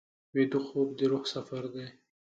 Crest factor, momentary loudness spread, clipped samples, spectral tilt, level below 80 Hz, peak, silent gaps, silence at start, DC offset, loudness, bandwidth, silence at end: 18 dB; 12 LU; under 0.1%; -6 dB/octave; -76 dBFS; -14 dBFS; none; 0.35 s; under 0.1%; -32 LUFS; 8 kHz; 0.35 s